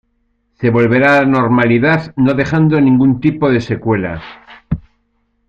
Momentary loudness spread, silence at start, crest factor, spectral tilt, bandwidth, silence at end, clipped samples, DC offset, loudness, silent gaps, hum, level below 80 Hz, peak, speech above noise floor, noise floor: 14 LU; 0.6 s; 12 dB; -8.5 dB/octave; 7.2 kHz; 0.7 s; under 0.1%; under 0.1%; -13 LUFS; none; none; -40 dBFS; 0 dBFS; 50 dB; -62 dBFS